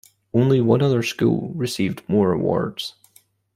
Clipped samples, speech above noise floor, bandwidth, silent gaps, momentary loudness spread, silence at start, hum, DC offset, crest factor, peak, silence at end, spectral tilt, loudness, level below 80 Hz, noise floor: under 0.1%; 38 dB; 15.5 kHz; none; 9 LU; 0.35 s; none; under 0.1%; 18 dB; -2 dBFS; 0.65 s; -6.5 dB/octave; -20 LUFS; -56 dBFS; -57 dBFS